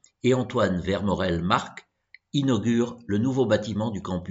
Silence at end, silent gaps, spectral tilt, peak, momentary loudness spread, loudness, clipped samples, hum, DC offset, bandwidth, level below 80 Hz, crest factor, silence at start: 0 s; none; -6.5 dB/octave; -4 dBFS; 6 LU; -25 LUFS; under 0.1%; none; under 0.1%; 8 kHz; -52 dBFS; 20 dB; 0.25 s